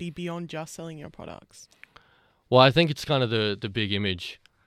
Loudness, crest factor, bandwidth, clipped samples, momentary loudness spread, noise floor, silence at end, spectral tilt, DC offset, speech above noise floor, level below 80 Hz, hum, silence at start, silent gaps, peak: -24 LUFS; 24 dB; 14.5 kHz; under 0.1%; 23 LU; -62 dBFS; 0.35 s; -5.5 dB/octave; under 0.1%; 37 dB; -60 dBFS; none; 0 s; none; -4 dBFS